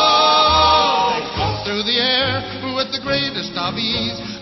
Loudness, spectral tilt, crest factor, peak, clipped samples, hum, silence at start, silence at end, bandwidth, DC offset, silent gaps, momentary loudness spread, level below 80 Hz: -17 LUFS; -4 dB/octave; 16 dB; -2 dBFS; under 0.1%; none; 0 s; 0 s; 6.2 kHz; under 0.1%; none; 10 LU; -40 dBFS